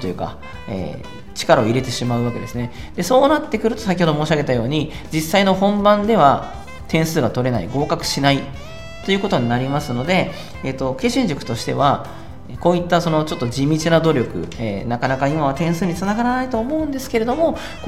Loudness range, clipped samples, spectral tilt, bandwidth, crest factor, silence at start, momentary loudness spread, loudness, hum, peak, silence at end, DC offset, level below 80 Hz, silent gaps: 3 LU; under 0.1%; -5.5 dB/octave; 16 kHz; 18 dB; 0 s; 13 LU; -19 LUFS; none; 0 dBFS; 0 s; 2%; -40 dBFS; none